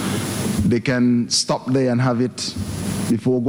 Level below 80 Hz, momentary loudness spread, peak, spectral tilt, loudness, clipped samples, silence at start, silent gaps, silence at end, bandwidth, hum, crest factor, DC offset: -44 dBFS; 7 LU; -6 dBFS; -5 dB/octave; -20 LUFS; under 0.1%; 0 s; none; 0 s; over 20 kHz; none; 12 dB; under 0.1%